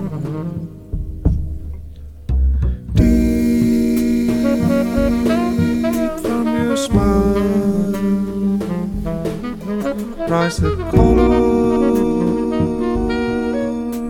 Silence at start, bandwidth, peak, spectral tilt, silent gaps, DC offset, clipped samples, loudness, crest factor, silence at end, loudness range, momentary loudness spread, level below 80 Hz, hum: 0 s; 17.5 kHz; 0 dBFS; -7.5 dB/octave; none; under 0.1%; under 0.1%; -17 LUFS; 16 dB; 0 s; 4 LU; 10 LU; -26 dBFS; none